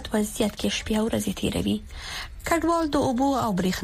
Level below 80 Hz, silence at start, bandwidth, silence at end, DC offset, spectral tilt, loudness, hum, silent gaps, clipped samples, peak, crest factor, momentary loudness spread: -42 dBFS; 0 s; 15.5 kHz; 0 s; under 0.1%; -4.5 dB/octave; -25 LUFS; none; none; under 0.1%; -8 dBFS; 16 dB; 9 LU